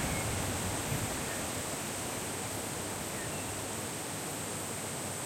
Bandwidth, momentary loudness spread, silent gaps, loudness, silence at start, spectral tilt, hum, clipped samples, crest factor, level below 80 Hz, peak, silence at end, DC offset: 16.5 kHz; 3 LU; none; -35 LUFS; 0 s; -3 dB/octave; none; under 0.1%; 16 dB; -54 dBFS; -20 dBFS; 0 s; under 0.1%